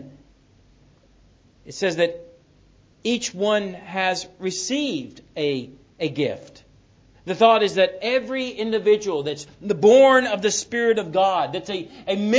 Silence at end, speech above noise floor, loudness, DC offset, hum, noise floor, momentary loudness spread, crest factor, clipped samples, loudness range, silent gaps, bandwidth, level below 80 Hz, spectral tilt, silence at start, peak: 0 s; 35 dB; -21 LUFS; under 0.1%; none; -55 dBFS; 15 LU; 22 dB; under 0.1%; 8 LU; none; 8 kHz; -60 dBFS; -3.5 dB/octave; 0 s; 0 dBFS